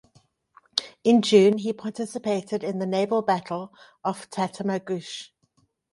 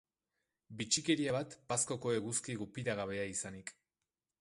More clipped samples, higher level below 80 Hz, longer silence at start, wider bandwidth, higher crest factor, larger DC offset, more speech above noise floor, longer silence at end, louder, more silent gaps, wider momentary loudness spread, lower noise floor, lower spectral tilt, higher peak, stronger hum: neither; about the same, -72 dBFS vs -70 dBFS; about the same, 0.75 s vs 0.7 s; about the same, 11.5 kHz vs 11.5 kHz; about the same, 24 dB vs 22 dB; neither; second, 44 dB vs over 53 dB; about the same, 0.65 s vs 0.7 s; first, -25 LUFS vs -37 LUFS; neither; first, 15 LU vs 12 LU; second, -68 dBFS vs under -90 dBFS; first, -5.5 dB/octave vs -3.5 dB/octave; first, -2 dBFS vs -18 dBFS; neither